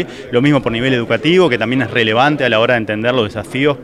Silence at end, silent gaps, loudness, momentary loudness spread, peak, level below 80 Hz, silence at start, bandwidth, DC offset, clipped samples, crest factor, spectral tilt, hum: 0 s; none; -14 LUFS; 5 LU; 0 dBFS; -44 dBFS; 0 s; 12.5 kHz; under 0.1%; under 0.1%; 14 dB; -6 dB/octave; none